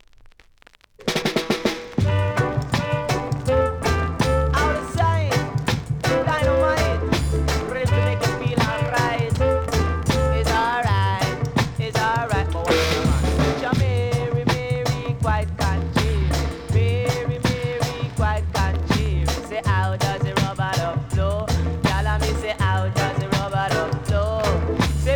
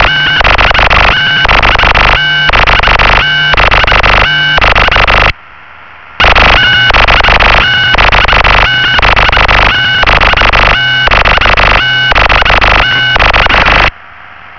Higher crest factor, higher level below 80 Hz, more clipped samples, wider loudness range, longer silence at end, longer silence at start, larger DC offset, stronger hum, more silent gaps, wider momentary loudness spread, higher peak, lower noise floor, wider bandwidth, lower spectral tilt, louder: first, 16 dB vs 6 dB; second, -30 dBFS vs -14 dBFS; neither; about the same, 2 LU vs 1 LU; about the same, 0 s vs 0 s; first, 1 s vs 0 s; second, under 0.1% vs 3%; neither; neither; about the same, 4 LU vs 2 LU; second, -4 dBFS vs 0 dBFS; first, -53 dBFS vs -32 dBFS; first, 19.5 kHz vs 5.4 kHz; first, -5.5 dB/octave vs -4 dB/octave; second, -22 LUFS vs -5 LUFS